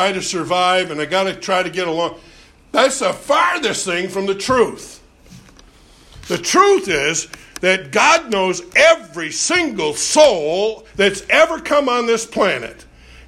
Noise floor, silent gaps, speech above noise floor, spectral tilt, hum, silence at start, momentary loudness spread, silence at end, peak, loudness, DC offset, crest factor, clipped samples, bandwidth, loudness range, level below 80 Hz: -46 dBFS; none; 30 dB; -2.5 dB/octave; none; 0 s; 10 LU; 0.45 s; 0 dBFS; -16 LUFS; under 0.1%; 18 dB; under 0.1%; 15.5 kHz; 4 LU; -50 dBFS